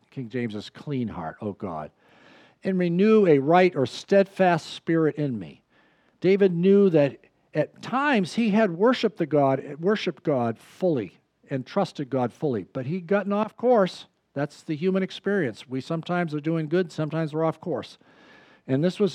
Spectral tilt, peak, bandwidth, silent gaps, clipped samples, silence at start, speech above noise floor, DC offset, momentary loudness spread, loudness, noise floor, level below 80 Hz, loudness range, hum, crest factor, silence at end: -7.5 dB/octave; -6 dBFS; 10.5 kHz; none; under 0.1%; 0.15 s; 38 dB; under 0.1%; 14 LU; -24 LUFS; -62 dBFS; -72 dBFS; 6 LU; none; 18 dB; 0 s